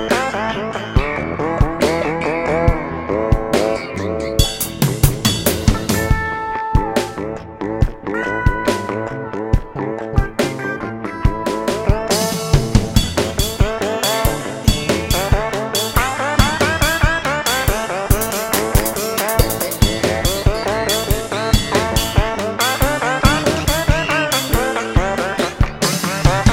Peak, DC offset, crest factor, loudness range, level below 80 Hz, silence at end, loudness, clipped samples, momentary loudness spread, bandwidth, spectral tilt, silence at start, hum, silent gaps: 0 dBFS; under 0.1%; 16 dB; 4 LU; -24 dBFS; 0 s; -18 LUFS; under 0.1%; 6 LU; 17 kHz; -4.5 dB/octave; 0 s; none; none